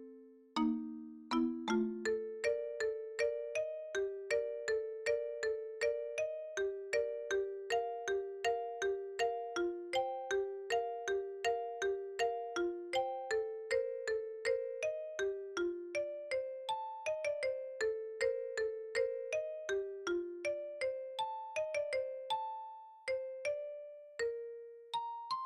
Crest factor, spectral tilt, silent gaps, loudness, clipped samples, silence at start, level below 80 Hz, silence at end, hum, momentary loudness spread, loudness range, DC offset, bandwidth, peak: 16 dB; -3 dB/octave; none; -39 LUFS; under 0.1%; 0 s; -74 dBFS; 0 s; none; 4 LU; 2 LU; under 0.1%; 12 kHz; -22 dBFS